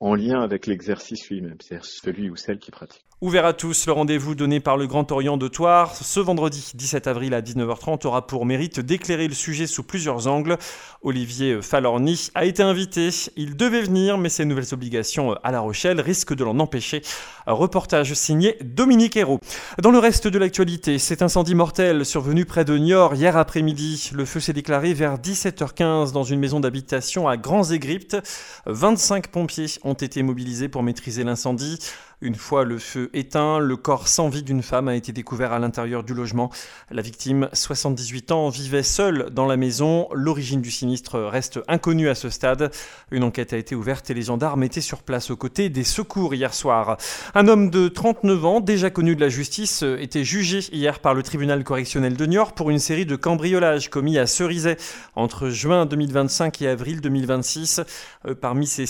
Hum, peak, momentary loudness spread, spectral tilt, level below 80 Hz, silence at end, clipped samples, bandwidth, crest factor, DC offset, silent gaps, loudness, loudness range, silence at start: none; 0 dBFS; 10 LU; -4.5 dB/octave; -44 dBFS; 0 s; under 0.1%; 19.5 kHz; 20 dB; under 0.1%; none; -21 LUFS; 6 LU; 0 s